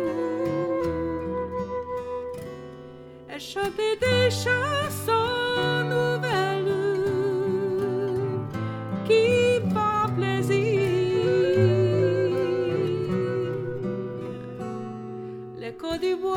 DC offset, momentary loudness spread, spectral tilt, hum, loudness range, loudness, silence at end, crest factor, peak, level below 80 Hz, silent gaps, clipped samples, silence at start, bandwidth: under 0.1%; 14 LU; -6 dB/octave; none; 8 LU; -25 LUFS; 0 s; 16 dB; -8 dBFS; -56 dBFS; none; under 0.1%; 0 s; 17 kHz